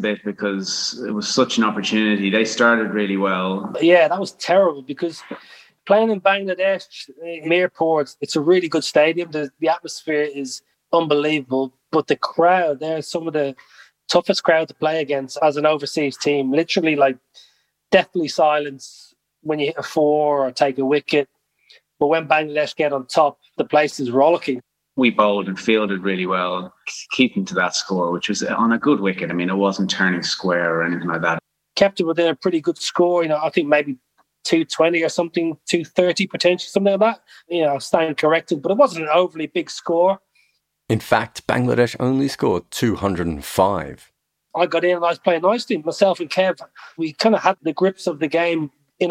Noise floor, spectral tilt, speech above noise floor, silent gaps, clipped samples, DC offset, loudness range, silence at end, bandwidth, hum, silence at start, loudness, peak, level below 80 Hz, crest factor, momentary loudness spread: -64 dBFS; -4.5 dB/octave; 45 dB; none; under 0.1%; under 0.1%; 2 LU; 0 s; 15.5 kHz; none; 0 s; -19 LUFS; -2 dBFS; -58 dBFS; 18 dB; 10 LU